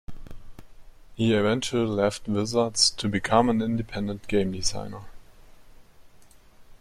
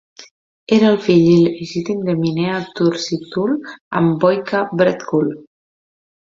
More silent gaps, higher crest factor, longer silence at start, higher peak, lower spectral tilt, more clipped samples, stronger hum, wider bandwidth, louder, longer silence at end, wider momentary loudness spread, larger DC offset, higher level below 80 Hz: second, none vs 0.31-0.67 s, 3.81-3.91 s; first, 22 dB vs 16 dB; about the same, 0.1 s vs 0.2 s; second, -6 dBFS vs -2 dBFS; second, -4 dB/octave vs -7 dB/octave; neither; neither; first, 14 kHz vs 7.6 kHz; second, -25 LUFS vs -17 LUFS; second, 0.1 s vs 0.9 s; about the same, 10 LU vs 10 LU; neither; first, -46 dBFS vs -56 dBFS